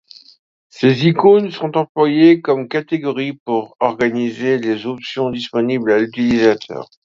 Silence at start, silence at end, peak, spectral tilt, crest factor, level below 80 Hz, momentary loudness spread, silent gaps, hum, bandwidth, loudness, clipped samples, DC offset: 0.75 s; 0.2 s; 0 dBFS; -7 dB/octave; 16 dB; -56 dBFS; 10 LU; 1.89-1.95 s, 3.40-3.46 s; none; 7.4 kHz; -16 LUFS; under 0.1%; under 0.1%